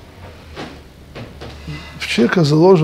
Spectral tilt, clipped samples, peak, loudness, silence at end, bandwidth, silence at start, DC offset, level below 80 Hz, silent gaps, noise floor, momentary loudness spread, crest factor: -6.5 dB/octave; under 0.1%; 0 dBFS; -14 LUFS; 0 s; 13.5 kHz; 0.2 s; under 0.1%; -42 dBFS; none; -37 dBFS; 24 LU; 16 dB